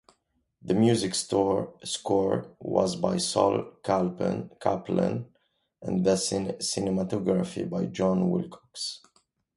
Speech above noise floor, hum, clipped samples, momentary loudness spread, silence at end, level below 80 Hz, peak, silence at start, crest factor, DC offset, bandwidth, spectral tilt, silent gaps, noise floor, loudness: 46 dB; none; under 0.1%; 10 LU; 0.6 s; -58 dBFS; -8 dBFS; 0.65 s; 20 dB; under 0.1%; 11.5 kHz; -5.5 dB/octave; none; -73 dBFS; -27 LUFS